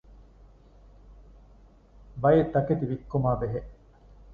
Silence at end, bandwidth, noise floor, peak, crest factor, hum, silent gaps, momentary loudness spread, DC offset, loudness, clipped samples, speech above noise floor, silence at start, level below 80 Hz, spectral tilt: 0 s; 4.8 kHz; -55 dBFS; -8 dBFS; 20 dB; none; none; 12 LU; under 0.1%; -26 LUFS; under 0.1%; 30 dB; 1.1 s; -48 dBFS; -11 dB/octave